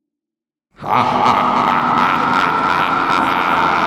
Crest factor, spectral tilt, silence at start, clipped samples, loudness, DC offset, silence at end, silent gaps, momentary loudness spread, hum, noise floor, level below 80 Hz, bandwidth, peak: 14 dB; -5 dB/octave; 0.8 s; under 0.1%; -14 LUFS; under 0.1%; 0 s; none; 2 LU; none; -87 dBFS; -48 dBFS; 14.5 kHz; -2 dBFS